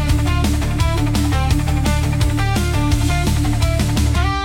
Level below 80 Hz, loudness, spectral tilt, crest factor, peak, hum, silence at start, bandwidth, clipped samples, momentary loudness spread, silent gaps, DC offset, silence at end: -20 dBFS; -18 LUFS; -5.5 dB/octave; 12 dB; -4 dBFS; none; 0 s; 17 kHz; under 0.1%; 1 LU; none; under 0.1%; 0 s